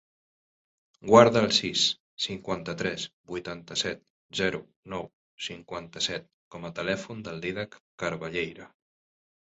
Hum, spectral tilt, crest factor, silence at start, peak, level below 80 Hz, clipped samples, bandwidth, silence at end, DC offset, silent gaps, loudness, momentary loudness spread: none; -3.5 dB/octave; 26 dB; 1.05 s; -2 dBFS; -60 dBFS; under 0.1%; 8.2 kHz; 0.9 s; under 0.1%; 2.00-2.17 s, 3.13-3.24 s, 4.10-4.29 s, 4.76-4.83 s, 5.13-5.38 s, 6.33-6.51 s, 7.80-7.98 s; -27 LUFS; 19 LU